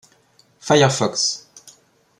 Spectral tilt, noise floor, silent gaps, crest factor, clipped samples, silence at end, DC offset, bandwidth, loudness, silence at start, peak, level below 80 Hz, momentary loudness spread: -3.5 dB/octave; -57 dBFS; none; 20 dB; under 0.1%; 0.5 s; under 0.1%; 13 kHz; -18 LUFS; 0.65 s; -2 dBFS; -60 dBFS; 17 LU